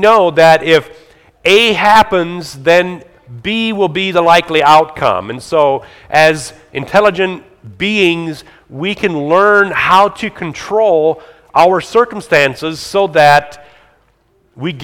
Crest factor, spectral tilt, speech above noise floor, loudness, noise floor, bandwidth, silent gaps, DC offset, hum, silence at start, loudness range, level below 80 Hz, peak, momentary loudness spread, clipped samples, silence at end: 12 dB; -4.5 dB/octave; 43 dB; -11 LUFS; -55 dBFS; 19 kHz; none; under 0.1%; none; 0 s; 3 LU; -46 dBFS; 0 dBFS; 13 LU; 0.7%; 0 s